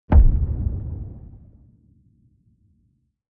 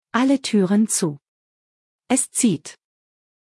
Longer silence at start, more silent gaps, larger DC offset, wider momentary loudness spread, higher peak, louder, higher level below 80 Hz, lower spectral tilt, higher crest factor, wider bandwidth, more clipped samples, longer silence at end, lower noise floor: about the same, 0.1 s vs 0.15 s; second, none vs 1.28-1.99 s; neither; first, 25 LU vs 11 LU; first, -2 dBFS vs -6 dBFS; second, -23 LUFS vs -20 LUFS; first, -22 dBFS vs -74 dBFS; first, -12.5 dB/octave vs -4 dB/octave; about the same, 20 dB vs 18 dB; second, 2.7 kHz vs 12 kHz; neither; first, 1.95 s vs 0.85 s; second, -66 dBFS vs under -90 dBFS